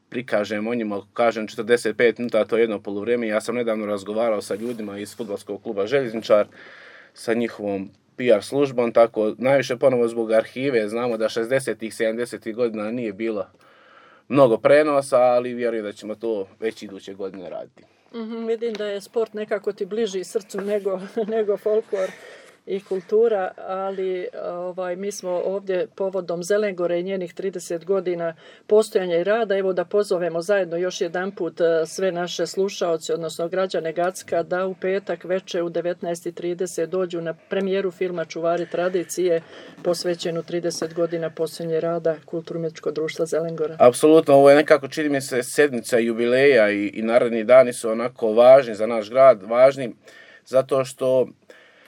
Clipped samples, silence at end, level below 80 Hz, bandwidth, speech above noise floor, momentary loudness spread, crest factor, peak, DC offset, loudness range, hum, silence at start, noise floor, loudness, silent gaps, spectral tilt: under 0.1%; 0.6 s; -80 dBFS; 17.5 kHz; 30 dB; 14 LU; 20 dB; -2 dBFS; under 0.1%; 9 LU; none; 0.1 s; -51 dBFS; -22 LUFS; none; -5 dB/octave